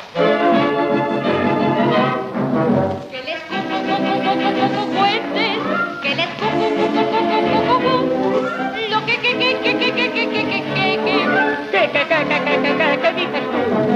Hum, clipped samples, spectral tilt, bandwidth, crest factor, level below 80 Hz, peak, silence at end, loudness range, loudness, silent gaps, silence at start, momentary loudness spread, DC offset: none; under 0.1%; -6 dB/octave; 11.5 kHz; 14 dB; -60 dBFS; -2 dBFS; 0 s; 2 LU; -17 LUFS; none; 0 s; 5 LU; under 0.1%